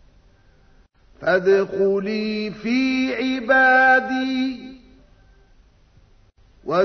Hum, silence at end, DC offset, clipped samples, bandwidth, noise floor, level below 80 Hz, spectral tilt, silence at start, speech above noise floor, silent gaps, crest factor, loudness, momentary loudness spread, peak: none; 0 s; under 0.1%; under 0.1%; 6.4 kHz; -54 dBFS; -54 dBFS; -5.5 dB/octave; 1.2 s; 35 dB; none; 18 dB; -19 LUFS; 13 LU; -4 dBFS